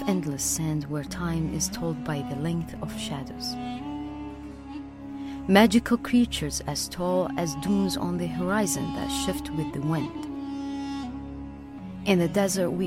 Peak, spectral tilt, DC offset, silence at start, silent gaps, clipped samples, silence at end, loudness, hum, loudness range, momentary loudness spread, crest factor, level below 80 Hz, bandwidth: -4 dBFS; -5 dB/octave; under 0.1%; 0 s; none; under 0.1%; 0 s; -27 LUFS; none; 7 LU; 15 LU; 24 dB; -46 dBFS; 16 kHz